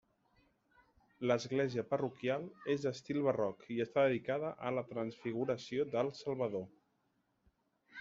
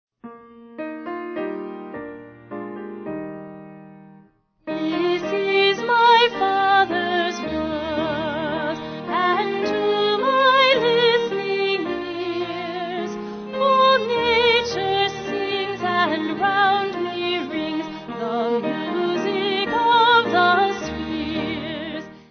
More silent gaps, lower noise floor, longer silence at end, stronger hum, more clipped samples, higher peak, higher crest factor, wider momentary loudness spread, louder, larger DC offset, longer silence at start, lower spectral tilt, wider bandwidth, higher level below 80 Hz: neither; first, -79 dBFS vs -54 dBFS; about the same, 0 s vs 0.1 s; neither; neither; second, -18 dBFS vs -4 dBFS; about the same, 20 dB vs 16 dB; second, 7 LU vs 16 LU; second, -37 LUFS vs -20 LUFS; neither; first, 1.2 s vs 0.25 s; about the same, -5.5 dB/octave vs -4.5 dB/octave; first, 7.6 kHz vs 6.6 kHz; second, -76 dBFS vs -54 dBFS